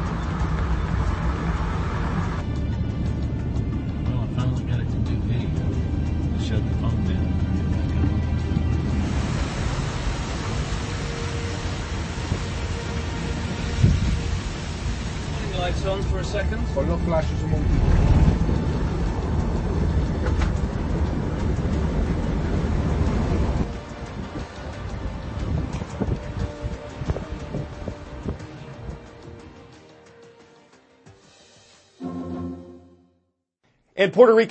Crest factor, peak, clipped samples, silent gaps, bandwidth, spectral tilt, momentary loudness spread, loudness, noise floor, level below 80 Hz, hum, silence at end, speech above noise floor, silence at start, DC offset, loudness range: 22 dB; -2 dBFS; under 0.1%; none; 8.6 kHz; -7 dB/octave; 11 LU; -25 LUFS; -71 dBFS; -28 dBFS; none; 0 s; 52 dB; 0 s; under 0.1%; 15 LU